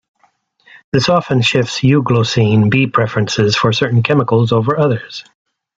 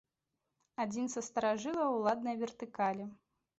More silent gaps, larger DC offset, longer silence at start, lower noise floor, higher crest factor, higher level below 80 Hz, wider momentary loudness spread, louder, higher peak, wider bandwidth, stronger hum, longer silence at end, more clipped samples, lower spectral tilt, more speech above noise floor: neither; neither; first, 0.95 s vs 0.8 s; second, -58 dBFS vs -87 dBFS; about the same, 14 dB vs 16 dB; first, -50 dBFS vs -78 dBFS; second, 4 LU vs 10 LU; first, -13 LUFS vs -36 LUFS; first, 0 dBFS vs -20 dBFS; about the same, 8 kHz vs 8 kHz; neither; about the same, 0.55 s vs 0.45 s; neither; first, -6 dB/octave vs -4.5 dB/octave; second, 45 dB vs 52 dB